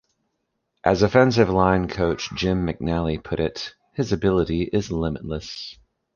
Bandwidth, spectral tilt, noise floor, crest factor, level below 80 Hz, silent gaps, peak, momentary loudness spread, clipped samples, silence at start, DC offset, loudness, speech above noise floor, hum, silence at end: 7.2 kHz; -6.5 dB/octave; -76 dBFS; 20 dB; -40 dBFS; none; -2 dBFS; 14 LU; under 0.1%; 0.85 s; under 0.1%; -22 LUFS; 54 dB; none; 0.4 s